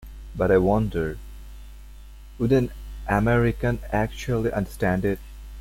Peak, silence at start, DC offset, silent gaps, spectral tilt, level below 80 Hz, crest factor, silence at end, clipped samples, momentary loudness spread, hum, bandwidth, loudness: -6 dBFS; 0 s; under 0.1%; none; -7.5 dB/octave; -36 dBFS; 18 dB; 0 s; under 0.1%; 20 LU; none; 16.5 kHz; -24 LUFS